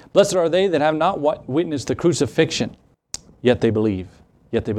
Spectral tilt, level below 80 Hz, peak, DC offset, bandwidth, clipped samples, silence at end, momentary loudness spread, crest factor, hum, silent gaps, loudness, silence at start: -5 dB/octave; -52 dBFS; -2 dBFS; under 0.1%; 13.5 kHz; under 0.1%; 0 s; 12 LU; 18 dB; none; none; -20 LUFS; 0.15 s